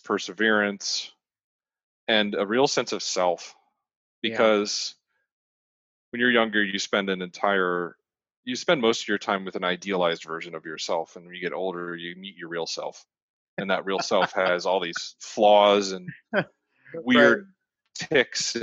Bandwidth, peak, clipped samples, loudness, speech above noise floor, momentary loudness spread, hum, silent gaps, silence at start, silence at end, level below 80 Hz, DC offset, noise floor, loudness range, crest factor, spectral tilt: 8.2 kHz; -4 dBFS; under 0.1%; -24 LUFS; over 65 dB; 16 LU; none; 1.44-1.59 s, 1.83-2.07 s, 3.96-4.22 s, 5.32-6.12 s, 8.37-8.43 s, 13.22-13.57 s; 0.05 s; 0 s; -72 dBFS; under 0.1%; under -90 dBFS; 7 LU; 22 dB; -3 dB/octave